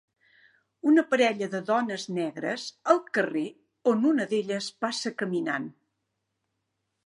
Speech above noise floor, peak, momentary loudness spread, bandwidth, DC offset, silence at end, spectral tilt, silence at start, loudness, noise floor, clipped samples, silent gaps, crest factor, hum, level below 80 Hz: 54 dB; -6 dBFS; 9 LU; 11.5 kHz; under 0.1%; 1.35 s; -4.5 dB/octave; 0.85 s; -27 LUFS; -80 dBFS; under 0.1%; none; 22 dB; none; -82 dBFS